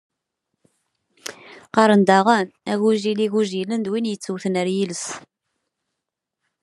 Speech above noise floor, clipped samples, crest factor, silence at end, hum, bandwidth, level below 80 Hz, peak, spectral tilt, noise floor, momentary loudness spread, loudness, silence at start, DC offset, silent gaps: 63 dB; under 0.1%; 22 dB; 1.45 s; none; 11.5 kHz; -72 dBFS; 0 dBFS; -5 dB/octave; -82 dBFS; 20 LU; -20 LUFS; 1.25 s; under 0.1%; none